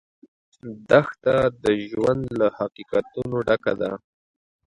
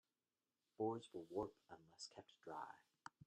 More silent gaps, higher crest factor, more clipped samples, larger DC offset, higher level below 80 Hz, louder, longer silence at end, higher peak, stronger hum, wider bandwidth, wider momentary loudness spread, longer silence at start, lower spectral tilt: neither; about the same, 22 dB vs 20 dB; neither; neither; first, -52 dBFS vs -84 dBFS; first, -23 LUFS vs -51 LUFS; first, 0.7 s vs 0 s; first, -2 dBFS vs -34 dBFS; neither; about the same, 11 kHz vs 12 kHz; about the same, 15 LU vs 16 LU; second, 0.65 s vs 0.8 s; first, -7 dB/octave vs -5.5 dB/octave